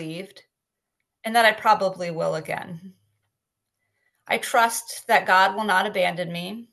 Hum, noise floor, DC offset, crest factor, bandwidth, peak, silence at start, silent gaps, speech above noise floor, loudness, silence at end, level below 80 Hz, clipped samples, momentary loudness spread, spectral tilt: none; -83 dBFS; under 0.1%; 22 dB; 13 kHz; -2 dBFS; 0 s; none; 61 dB; -22 LUFS; 0.1 s; -74 dBFS; under 0.1%; 17 LU; -3 dB/octave